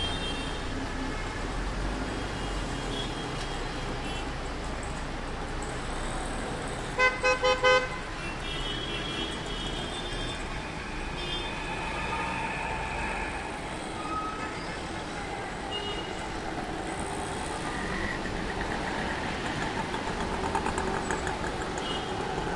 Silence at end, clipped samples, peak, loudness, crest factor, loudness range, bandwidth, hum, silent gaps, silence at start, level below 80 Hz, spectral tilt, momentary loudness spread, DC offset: 0 s; under 0.1%; -12 dBFS; -32 LUFS; 20 dB; 7 LU; 11.5 kHz; none; none; 0 s; -40 dBFS; -4 dB/octave; 6 LU; under 0.1%